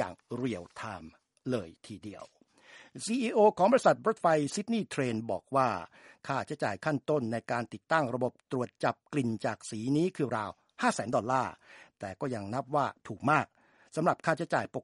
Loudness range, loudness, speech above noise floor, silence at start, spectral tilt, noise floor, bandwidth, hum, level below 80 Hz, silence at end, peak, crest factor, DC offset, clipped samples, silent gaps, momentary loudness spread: 5 LU; -31 LUFS; 26 dB; 0 s; -5.5 dB/octave; -57 dBFS; 11.5 kHz; none; -72 dBFS; 0 s; -10 dBFS; 22 dB; under 0.1%; under 0.1%; none; 15 LU